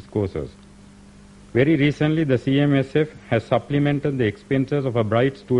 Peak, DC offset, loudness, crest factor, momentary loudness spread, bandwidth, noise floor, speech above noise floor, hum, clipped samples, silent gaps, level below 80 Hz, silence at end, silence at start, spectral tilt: -6 dBFS; under 0.1%; -21 LUFS; 16 dB; 7 LU; 10 kHz; -46 dBFS; 26 dB; 50 Hz at -45 dBFS; under 0.1%; none; -48 dBFS; 0 s; 0.1 s; -8 dB/octave